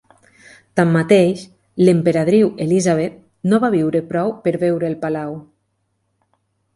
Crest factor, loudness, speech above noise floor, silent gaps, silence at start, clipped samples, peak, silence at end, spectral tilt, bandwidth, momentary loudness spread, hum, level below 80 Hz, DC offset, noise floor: 16 dB; -17 LUFS; 53 dB; none; 0.75 s; under 0.1%; 0 dBFS; 1.35 s; -7 dB/octave; 11.5 kHz; 12 LU; none; -58 dBFS; under 0.1%; -69 dBFS